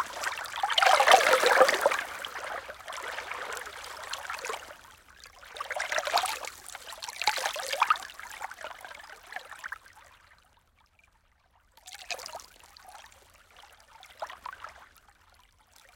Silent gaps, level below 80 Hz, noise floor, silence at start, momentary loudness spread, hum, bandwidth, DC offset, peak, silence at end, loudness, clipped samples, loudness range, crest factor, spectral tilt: none; -66 dBFS; -66 dBFS; 0 s; 24 LU; none; 17 kHz; under 0.1%; -4 dBFS; 1.1 s; -28 LUFS; under 0.1%; 21 LU; 28 dB; 0.5 dB/octave